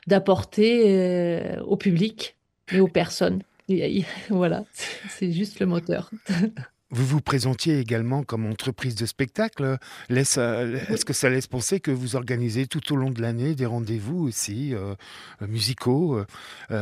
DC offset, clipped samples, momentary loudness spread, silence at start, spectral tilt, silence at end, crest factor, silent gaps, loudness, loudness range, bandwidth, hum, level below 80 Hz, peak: under 0.1%; under 0.1%; 11 LU; 0.05 s; -5.5 dB/octave; 0 s; 20 dB; none; -25 LUFS; 4 LU; 15.5 kHz; none; -58 dBFS; -6 dBFS